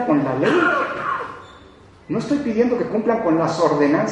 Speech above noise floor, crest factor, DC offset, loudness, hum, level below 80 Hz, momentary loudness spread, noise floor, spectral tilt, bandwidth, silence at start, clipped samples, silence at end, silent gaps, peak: 28 dB; 16 dB; under 0.1%; -19 LUFS; none; -54 dBFS; 10 LU; -46 dBFS; -6.5 dB/octave; 10.5 kHz; 0 s; under 0.1%; 0 s; none; -4 dBFS